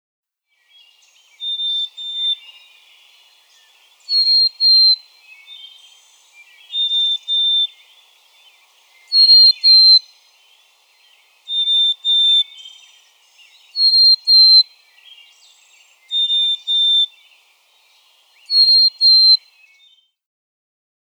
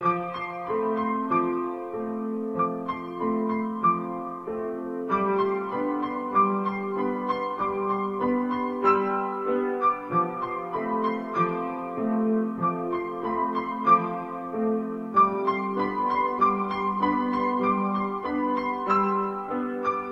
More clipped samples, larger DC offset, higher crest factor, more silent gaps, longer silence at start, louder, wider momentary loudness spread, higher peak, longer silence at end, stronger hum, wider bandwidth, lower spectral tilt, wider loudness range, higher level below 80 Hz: neither; neither; about the same, 14 dB vs 18 dB; neither; first, 1.4 s vs 0 s; first, -11 LUFS vs -26 LUFS; first, 15 LU vs 8 LU; first, -2 dBFS vs -8 dBFS; first, 1.7 s vs 0 s; neither; first, 13.5 kHz vs 7.4 kHz; second, 9.5 dB/octave vs -8.5 dB/octave; first, 8 LU vs 3 LU; second, under -90 dBFS vs -62 dBFS